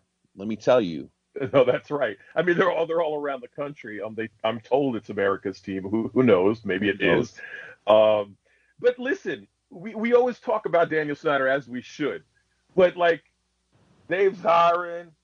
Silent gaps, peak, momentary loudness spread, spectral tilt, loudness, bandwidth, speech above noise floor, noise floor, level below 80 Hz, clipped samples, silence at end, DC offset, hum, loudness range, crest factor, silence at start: none; -6 dBFS; 15 LU; -6.5 dB/octave; -24 LUFS; 7 kHz; 45 dB; -68 dBFS; -64 dBFS; under 0.1%; 0.2 s; under 0.1%; none; 3 LU; 20 dB; 0.35 s